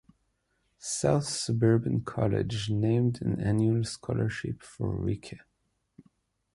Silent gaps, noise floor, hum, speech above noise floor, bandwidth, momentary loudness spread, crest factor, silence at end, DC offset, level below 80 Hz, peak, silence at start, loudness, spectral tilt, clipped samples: none; -76 dBFS; none; 48 dB; 11.5 kHz; 11 LU; 18 dB; 1.15 s; under 0.1%; -52 dBFS; -10 dBFS; 0.8 s; -29 LUFS; -6 dB/octave; under 0.1%